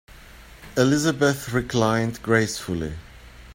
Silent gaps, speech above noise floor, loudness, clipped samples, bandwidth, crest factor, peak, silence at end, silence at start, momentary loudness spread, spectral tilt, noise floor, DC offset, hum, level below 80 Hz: none; 23 dB; -23 LUFS; under 0.1%; 16.5 kHz; 20 dB; -4 dBFS; 0 s; 0.1 s; 10 LU; -5 dB/octave; -45 dBFS; under 0.1%; none; -46 dBFS